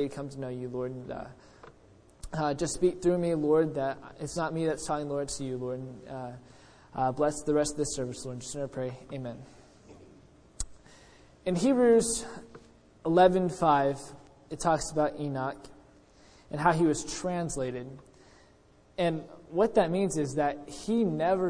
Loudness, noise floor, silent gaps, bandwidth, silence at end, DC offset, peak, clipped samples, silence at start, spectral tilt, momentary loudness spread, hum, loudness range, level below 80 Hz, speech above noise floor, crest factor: -29 LUFS; -60 dBFS; none; 10.5 kHz; 0 s; under 0.1%; -8 dBFS; under 0.1%; 0 s; -5.5 dB/octave; 16 LU; none; 8 LU; -54 dBFS; 31 dB; 22 dB